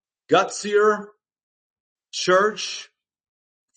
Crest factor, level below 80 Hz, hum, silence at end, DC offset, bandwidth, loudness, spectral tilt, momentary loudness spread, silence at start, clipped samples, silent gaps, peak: 20 dB; -76 dBFS; none; 0.9 s; under 0.1%; 8.8 kHz; -21 LUFS; -3 dB/octave; 11 LU; 0.3 s; under 0.1%; 1.43-1.96 s; -4 dBFS